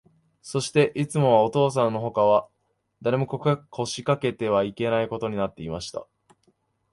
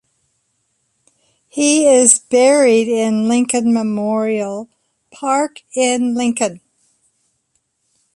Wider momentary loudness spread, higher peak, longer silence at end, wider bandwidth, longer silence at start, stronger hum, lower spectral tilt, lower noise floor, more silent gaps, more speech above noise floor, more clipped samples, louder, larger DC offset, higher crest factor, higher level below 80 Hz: about the same, 11 LU vs 12 LU; second, -6 dBFS vs 0 dBFS; second, 0.9 s vs 1.6 s; about the same, 11.5 kHz vs 11.5 kHz; second, 0.45 s vs 1.55 s; neither; first, -6 dB/octave vs -3 dB/octave; about the same, -68 dBFS vs -67 dBFS; neither; second, 44 dB vs 53 dB; neither; second, -24 LUFS vs -14 LUFS; neither; about the same, 18 dB vs 16 dB; first, -58 dBFS vs -64 dBFS